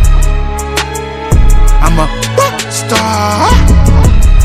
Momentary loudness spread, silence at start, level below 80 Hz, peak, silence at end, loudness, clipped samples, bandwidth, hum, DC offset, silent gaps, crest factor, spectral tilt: 7 LU; 0 s; -8 dBFS; 0 dBFS; 0 s; -11 LUFS; 2%; 15.5 kHz; none; under 0.1%; none; 8 dB; -5 dB/octave